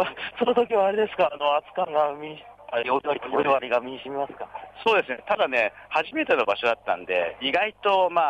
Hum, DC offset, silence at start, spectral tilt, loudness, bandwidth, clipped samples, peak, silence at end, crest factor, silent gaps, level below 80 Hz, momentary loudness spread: none; under 0.1%; 0 s; -5 dB/octave; -24 LUFS; 9 kHz; under 0.1%; -10 dBFS; 0 s; 14 dB; none; -64 dBFS; 10 LU